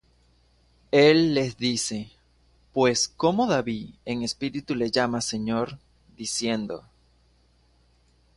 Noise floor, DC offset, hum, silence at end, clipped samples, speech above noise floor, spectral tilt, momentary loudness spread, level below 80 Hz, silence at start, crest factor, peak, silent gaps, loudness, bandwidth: -62 dBFS; under 0.1%; none; 1.55 s; under 0.1%; 38 dB; -4 dB/octave; 15 LU; -58 dBFS; 0.95 s; 20 dB; -6 dBFS; none; -25 LUFS; 11.5 kHz